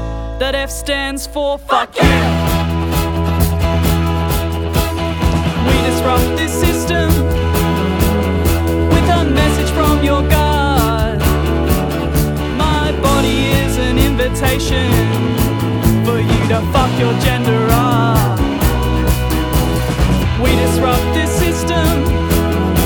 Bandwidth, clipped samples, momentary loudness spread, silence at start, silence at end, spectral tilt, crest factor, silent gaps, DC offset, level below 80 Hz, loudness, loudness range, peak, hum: over 20 kHz; under 0.1%; 4 LU; 0 s; 0 s; -5.5 dB/octave; 14 dB; none; under 0.1%; -20 dBFS; -15 LUFS; 2 LU; 0 dBFS; none